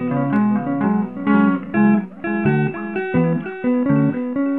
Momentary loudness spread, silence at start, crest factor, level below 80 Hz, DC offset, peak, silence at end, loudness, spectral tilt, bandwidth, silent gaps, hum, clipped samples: 5 LU; 0 s; 14 dB; -56 dBFS; 0.4%; -4 dBFS; 0 s; -19 LUFS; -11.5 dB/octave; 4 kHz; none; none; under 0.1%